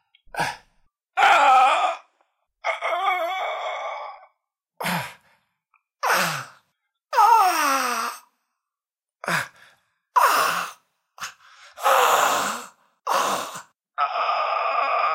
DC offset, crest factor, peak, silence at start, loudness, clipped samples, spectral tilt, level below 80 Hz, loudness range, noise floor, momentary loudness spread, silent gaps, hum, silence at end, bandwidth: under 0.1%; 18 dB; -6 dBFS; 0.35 s; -21 LUFS; under 0.1%; -1.5 dB/octave; -70 dBFS; 7 LU; under -90 dBFS; 20 LU; none; none; 0 s; 16 kHz